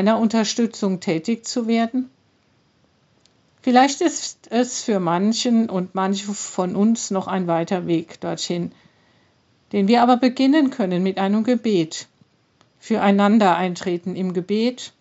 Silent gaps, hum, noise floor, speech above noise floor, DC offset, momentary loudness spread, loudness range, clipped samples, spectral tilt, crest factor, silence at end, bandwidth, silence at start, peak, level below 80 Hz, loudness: none; none; -61 dBFS; 42 dB; under 0.1%; 10 LU; 4 LU; under 0.1%; -5 dB/octave; 18 dB; 0.15 s; 8 kHz; 0 s; -2 dBFS; -74 dBFS; -20 LUFS